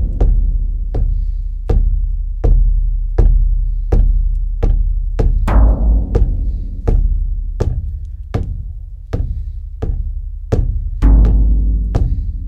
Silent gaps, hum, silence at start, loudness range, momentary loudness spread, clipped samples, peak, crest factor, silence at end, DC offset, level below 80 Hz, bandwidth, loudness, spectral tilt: none; none; 0 s; 6 LU; 12 LU; under 0.1%; 0 dBFS; 14 dB; 0 s; under 0.1%; -14 dBFS; 2.7 kHz; -18 LUFS; -9.5 dB/octave